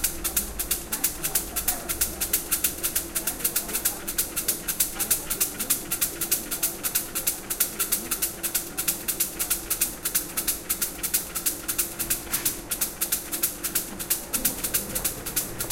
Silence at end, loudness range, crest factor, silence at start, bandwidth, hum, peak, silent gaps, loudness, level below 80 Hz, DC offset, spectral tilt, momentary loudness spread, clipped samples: 0 s; 1 LU; 22 dB; 0 s; 17 kHz; none; -6 dBFS; none; -25 LUFS; -46 dBFS; under 0.1%; -1 dB/octave; 3 LU; under 0.1%